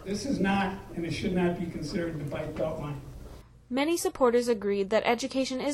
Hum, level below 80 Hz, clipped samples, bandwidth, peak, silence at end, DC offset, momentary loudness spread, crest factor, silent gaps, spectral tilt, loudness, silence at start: none; -50 dBFS; under 0.1%; 15.5 kHz; -12 dBFS; 0 s; under 0.1%; 11 LU; 18 dB; none; -5.5 dB/octave; -29 LUFS; 0 s